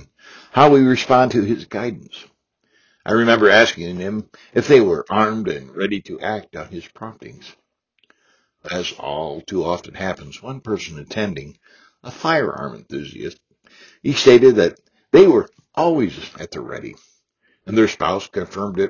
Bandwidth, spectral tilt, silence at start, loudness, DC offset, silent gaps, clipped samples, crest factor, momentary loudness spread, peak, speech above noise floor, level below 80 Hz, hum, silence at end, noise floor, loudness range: 7.2 kHz; -5.5 dB/octave; 0.55 s; -17 LUFS; under 0.1%; none; under 0.1%; 18 dB; 21 LU; 0 dBFS; 47 dB; -52 dBFS; none; 0 s; -65 dBFS; 13 LU